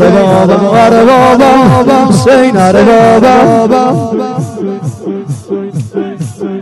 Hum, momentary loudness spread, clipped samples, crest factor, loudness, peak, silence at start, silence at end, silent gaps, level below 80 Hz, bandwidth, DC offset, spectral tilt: none; 13 LU; 7%; 6 dB; -6 LUFS; 0 dBFS; 0 s; 0 s; none; -38 dBFS; 12.5 kHz; under 0.1%; -6.5 dB/octave